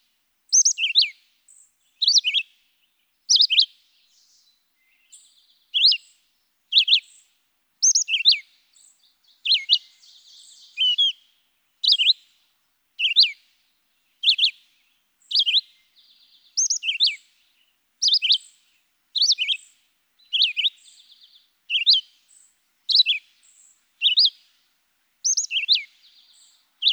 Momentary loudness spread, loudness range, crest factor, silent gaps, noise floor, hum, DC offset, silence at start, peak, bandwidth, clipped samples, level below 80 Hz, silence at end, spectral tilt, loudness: 9 LU; 3 LU; 18 dB; none; -69 dBFS; none; under 0.1%; 0.5 s; -6 dBFS; over 20 kHz; under 0.1%; under -90 dBFS; 0 s; 10 dB/octave; -18 LUFS